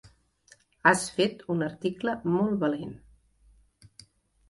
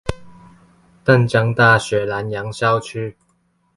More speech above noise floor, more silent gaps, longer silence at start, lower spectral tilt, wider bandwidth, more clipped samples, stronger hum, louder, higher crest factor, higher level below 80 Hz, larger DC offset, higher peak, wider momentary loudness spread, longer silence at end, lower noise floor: second, 34 dB vs 46 dB; neither; first, 0.85 s vs 0.05 s; about the same, -5 dB/octave vs -6 dB/octave; about the same, 11.5 kHz vs 11.5 kHz; neither; neither; second, -27 LUFS vs -17 LUFS; first, 24 dB vs 18 dB; second, -62 dBFS vs -44 dBFS; neither; second, -6 dBFS vs 0 dBFS; second, 8 LU vs 15 LU; first, 1.55 s vs 0.65 s; about the same, -61 dBFS vs -63 dBFS